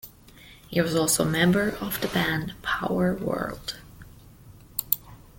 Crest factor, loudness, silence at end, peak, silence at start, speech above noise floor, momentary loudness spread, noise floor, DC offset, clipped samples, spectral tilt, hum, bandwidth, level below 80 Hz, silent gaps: 28 dB; -26 LUFS; 0.2 s; 0 dBFS; 0.05 s; 25 dB; 12 LU; -50 dBFS; under 0.1%; under 0.1%; -4.5 dB/octave; none; 17 kHz; -50 dBFS; none